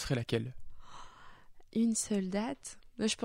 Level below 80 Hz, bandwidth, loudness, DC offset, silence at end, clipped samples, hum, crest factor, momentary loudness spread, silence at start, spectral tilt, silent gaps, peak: -56 dBFS; 16 kHz; -35 LUFS; under 0.1%; 0 s; under 0.1%; none; 18 dB; 22 LU; 0 s; -4.5 dB/octave; none; -18 dBFS